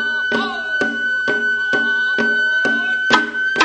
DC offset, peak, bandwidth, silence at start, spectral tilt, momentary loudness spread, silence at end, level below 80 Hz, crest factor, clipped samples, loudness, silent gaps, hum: under 0.1%; 0 dBFS; 9 kHz; 0 s; -2.5 dB/octave; 4 LU; 0 s; -58 dBFS; 18 dB; under 0.1%; -17 LUFS; none; none